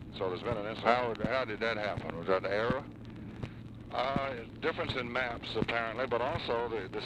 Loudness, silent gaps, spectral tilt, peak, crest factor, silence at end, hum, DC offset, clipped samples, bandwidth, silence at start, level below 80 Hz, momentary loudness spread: -34 LUFS; none; -6.5 dB/octave; -12 dBFS; 22 dB; 0 s; none; under 0.1%; under 0.1%; 10.5 kHz; 0 s; -54 dBFS; 13 LU